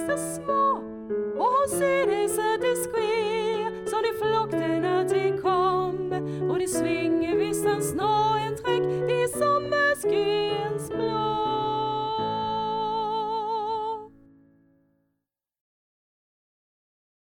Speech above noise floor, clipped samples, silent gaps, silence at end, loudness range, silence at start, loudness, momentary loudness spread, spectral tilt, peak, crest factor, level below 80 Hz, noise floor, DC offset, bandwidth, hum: 57 dB; under 0.1%; none; 3.25 s; 7 LU; 0 s; -25 LUFS; 6 LU; -4.5 dB/octave; -12 dBFS; 14 dB; -58 dBFS; -82 dBFS; under 0.1%; 18.5 kHz; none